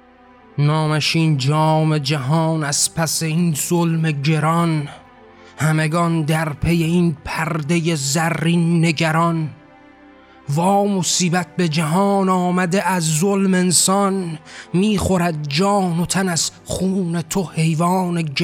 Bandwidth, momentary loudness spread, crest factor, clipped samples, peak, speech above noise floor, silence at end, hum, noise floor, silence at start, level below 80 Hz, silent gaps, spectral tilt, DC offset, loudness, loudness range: 16 kHz; 6 LU; 14 dB; under 0.1%; -4 dBFS; 30 dB; 0 s; none; -47 dBFS; 0.55 s; -48 dBFS; none; -5 dB/octave; under 0.1%; -18 LUFS; 2 LU